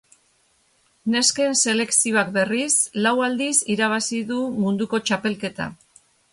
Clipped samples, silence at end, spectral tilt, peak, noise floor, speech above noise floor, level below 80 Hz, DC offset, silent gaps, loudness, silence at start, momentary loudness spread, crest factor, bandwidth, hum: under 0.1%; 0.6 s; -2.5 dB/octave; -4 dBFS; -63 dBFS; 41 dB; -64 dBFS; under 0.1%; none; -20 LUFS; 1.05 s; 9 LU; 18 dB; 11.5 kHz; none